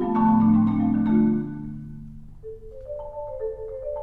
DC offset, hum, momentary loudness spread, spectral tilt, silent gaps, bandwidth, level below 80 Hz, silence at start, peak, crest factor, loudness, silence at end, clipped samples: under 0.1%; none; 23 LU; -11.5 dB/octave; none; 3.9 kHz; -44 dBFS; 0 s; -10 dBFS; 14 dB; -22 LUFS; 0 s; under 0.1%